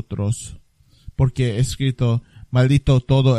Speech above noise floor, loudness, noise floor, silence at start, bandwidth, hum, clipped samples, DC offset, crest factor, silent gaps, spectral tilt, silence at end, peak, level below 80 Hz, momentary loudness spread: 25 dB; -20 LUFS; -43 dBFS; 0.1 s; 12 kHz; none; under 0.1%; under 0.1%; 16 dB; none; -7 dB/octave; 0 s; -4 dBFS; -34 dBFS; 11 LU